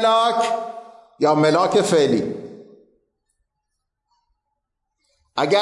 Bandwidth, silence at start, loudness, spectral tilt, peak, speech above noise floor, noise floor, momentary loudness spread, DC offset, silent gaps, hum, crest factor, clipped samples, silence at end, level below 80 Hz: 11.5 kHz; 0 s; -19 LUFS; -5 dB/octave; -6 dBFS; 60 dB; -78 dBFS; 18 LU; under 0.1%; none; none; 16 dB; under 0.1%; 0 s; -68 dBFS